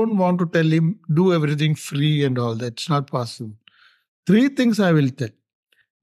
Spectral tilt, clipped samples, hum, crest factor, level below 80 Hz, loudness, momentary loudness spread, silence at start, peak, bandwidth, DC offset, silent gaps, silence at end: -7 dB/octave; under 0.1%; none; 14 dB; -68 dBFS; -20 LUFS; 13 LU; 0 s; -6 dBFS; 13 kHz; under 0.1%; 4.08-4.23 s; 0.75 s